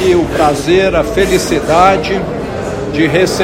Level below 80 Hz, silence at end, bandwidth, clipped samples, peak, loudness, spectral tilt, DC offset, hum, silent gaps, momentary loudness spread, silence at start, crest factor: -30 dBFS; 0 s; 16 kHz; 0.3%; 0 dBFS; -12 LUFS; -5 dB/octave; under 0.1%; none; none; 10 LU; 0 s; 12 dB